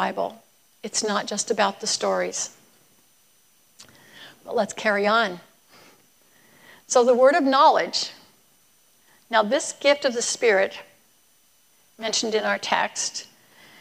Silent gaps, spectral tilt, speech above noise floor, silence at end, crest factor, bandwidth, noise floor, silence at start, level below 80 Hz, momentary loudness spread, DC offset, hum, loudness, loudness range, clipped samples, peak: none; -2 dB/octave; 39 dB; 0.6 s; 20 dB; 15.5 kHz; -61 dBFS; 0 s; -78 dBFS; 14 LU; under 0.1%; none; -22 LUFS; 6 LU; under 0.1%; -4 dBFS